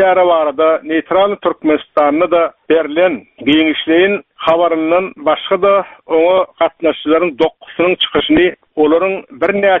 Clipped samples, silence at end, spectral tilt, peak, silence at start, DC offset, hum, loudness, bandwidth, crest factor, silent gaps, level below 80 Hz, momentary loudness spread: under 0.1%; 0 s; -2 dB/octave; 0 dBFS; 0 s; under 0.1%; none; -13 LUFS; 4 kHz; 12 dB; none; -48 dBFS; 5 LU